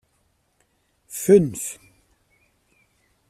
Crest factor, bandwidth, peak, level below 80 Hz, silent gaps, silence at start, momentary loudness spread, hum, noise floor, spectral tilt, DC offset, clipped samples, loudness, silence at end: 22 dB; 15 kHz; -4 dBFS; -60 dBFS; none; 1.1 s; 20 LU; none; -67 dBFS; -6.5 dB/octave; under 0.1%; under 0.1%; -20 LUFS; 1.55 s